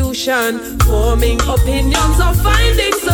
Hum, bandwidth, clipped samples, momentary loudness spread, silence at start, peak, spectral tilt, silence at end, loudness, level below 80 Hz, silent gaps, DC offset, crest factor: none; 20 kHz; under 0.1%; 3 LU; 0 s; -2 dBFS; -4.5 dB/octave; 0 s; -14 LUFS; -16 dBFS; none; under 0.1%; 10 dB